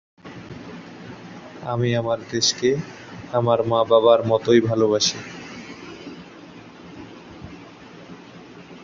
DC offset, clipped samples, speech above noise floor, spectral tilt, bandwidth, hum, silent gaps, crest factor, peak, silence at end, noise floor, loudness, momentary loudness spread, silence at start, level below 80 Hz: under 0.1%; under 0.1%; 23 dB; -4.5 dB/octave; 7.6 kHz; none; none; 20 dB; -2 dBFS; 0 s; -42 dBFS; -19 LUFS; 25 LU; 0.25 s; -58 dBFS